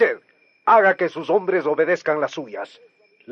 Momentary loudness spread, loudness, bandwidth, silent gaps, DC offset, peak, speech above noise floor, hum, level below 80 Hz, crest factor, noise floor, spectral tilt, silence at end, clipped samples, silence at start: 18 LU; -19 LUFS; 7.4 kHz; none; under 0.1%; -4 dBFS; 37 dB; none; -78 dBFS; 16 dB; -56 dBFS; -5.5 dB/octave; 0 s; under 0.1%; 0 s